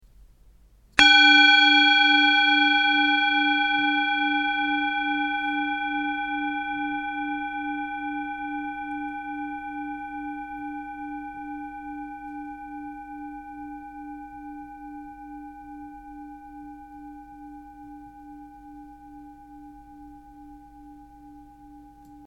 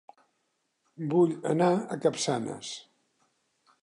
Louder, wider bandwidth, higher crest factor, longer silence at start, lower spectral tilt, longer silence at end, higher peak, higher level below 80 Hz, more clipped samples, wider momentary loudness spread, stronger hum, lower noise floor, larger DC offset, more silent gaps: first, -20 LUFS vs -28 LUFS; about the same, 10.5 kHz vs 11 kHz; first, 26 dB vs 18 dB; about the same, 0.95 s vs 1 s; second, -1.5 dB/octave vs -5.5 dB/octave; second, 0 s vs 1.05 s; first, 0 dBFS vs -12 dBFS; first, -56 dBFS vs -78 dBFS; neither; first, 27 LU vs 13 LU; neither; second, -55 dBFS vs -77 dBFS; neither; neither